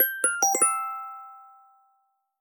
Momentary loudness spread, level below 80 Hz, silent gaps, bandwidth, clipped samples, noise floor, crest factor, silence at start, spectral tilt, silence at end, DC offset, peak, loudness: 19 LU; -78 dBFS; none; over 20 kHz; under 0.1%; -71 dBFS; 18 dB; 0 s; 1.5 dB/octave; 0.95 s; under 0.1%; -10 dBFS; -23 LUFS